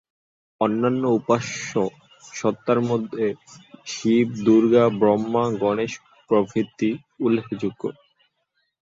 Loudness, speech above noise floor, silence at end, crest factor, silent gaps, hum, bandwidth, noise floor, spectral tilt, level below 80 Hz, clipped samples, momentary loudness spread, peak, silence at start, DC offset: -22 LUFS; 52 dB; 0.95 s; 18 dB; none; none; 7.8 kHz; -73 dBFS; -6 dB/octave; -62 dBFS; under 0.1%; 12 LU; -4 dBFS; 0.6 s; under 0.1%